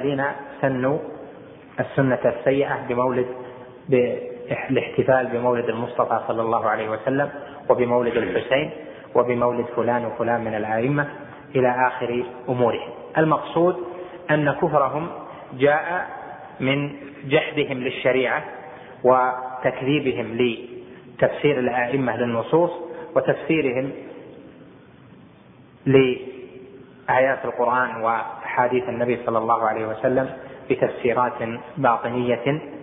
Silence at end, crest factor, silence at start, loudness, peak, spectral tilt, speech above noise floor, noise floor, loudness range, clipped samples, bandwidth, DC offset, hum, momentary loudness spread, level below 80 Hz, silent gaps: 0 s; 20 dB; 0 s; -22 LUFS; -2 dBFS; -10.5 dB/octave; 27 dB; -49 dBFS; 2 LU; under 0.1%; 3.9 kHz; under 0.1%; none; 16 LU; -60 dBFS; none